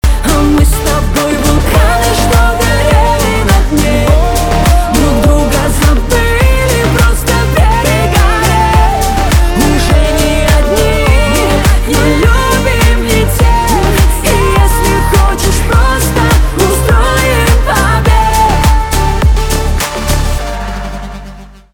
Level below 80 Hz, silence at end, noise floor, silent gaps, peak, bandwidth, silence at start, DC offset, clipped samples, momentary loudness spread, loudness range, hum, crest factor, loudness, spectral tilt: -12 dBFS; 0.25 s; -30 dBFS; none; 0 dBFS; over 20 kHz; 0.05 s; under 0.1%; under 0.1%; 3 LU; 0 LU; none; 8 dB; -10 LUFS; -5 dB/octave